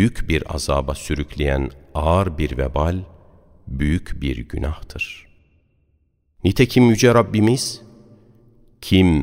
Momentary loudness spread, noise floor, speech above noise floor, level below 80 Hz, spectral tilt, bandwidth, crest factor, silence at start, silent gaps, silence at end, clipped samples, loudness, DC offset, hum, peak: 14 LU; -64 dBFS; 45 dB; -30 dBFS; -6 dB/octave; 16 kHz; 20 dB; 0 s; none; 0 s; under 0.1%; -20 LUFS; under 0.1%; none; 0 dBFS